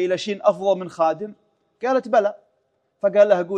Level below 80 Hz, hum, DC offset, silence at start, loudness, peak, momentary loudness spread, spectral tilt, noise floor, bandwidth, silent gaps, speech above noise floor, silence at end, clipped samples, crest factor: -74 dBFS; none; under 0.1%; 0 s; -21 LUFS; -2 dBFS; 11 LU; -5.5 dB/octave; -69 dBFS; 9 kHz; none; 49 dB; 0 s; under 0.1%; 18 dB